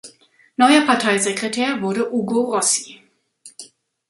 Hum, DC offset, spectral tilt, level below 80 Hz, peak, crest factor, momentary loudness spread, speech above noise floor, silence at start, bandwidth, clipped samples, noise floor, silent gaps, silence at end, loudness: none; under 0.1%; -2.5 dB/octave; -68 dBFS; -2 dBFS; 18 dB; 19 LU; 34 dB; 0.05 s; 11.5 kHz; under 0.1%; -52 dBFS; none; 0.45 s; -18 LUFS